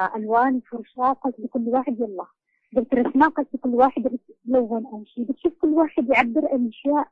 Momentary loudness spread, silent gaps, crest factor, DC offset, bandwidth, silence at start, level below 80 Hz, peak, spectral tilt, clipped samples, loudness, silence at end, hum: 11 LU; none; 18 dB; under 0.1%; 5.6 kHz; 0 s; -60 dBFS; -4 dBFS; -7.5 dB/octave; under 0.1%; -22 LUFS; 0.1 s; none